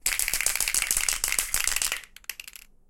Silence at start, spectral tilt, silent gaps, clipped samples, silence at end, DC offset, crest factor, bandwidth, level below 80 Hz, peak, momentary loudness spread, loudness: 0.05 s; 2 dB/octave; none; under 0.1%; 0.4 s; under 0.1%; 24 dB; 17 kHz; -44 dBFS; -4 dBFS; 15 LU; -24 LUFS